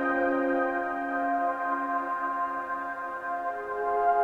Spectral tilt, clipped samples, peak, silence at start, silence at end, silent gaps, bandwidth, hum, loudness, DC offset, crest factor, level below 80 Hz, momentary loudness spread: -6 dB/octave; under 0.1%; -14 dBFS; 0 s; 0 s; none; 7.4 kHz; none; -29 LUFS; under 0.1%; 14 dB; -64 dBFS; 7 LU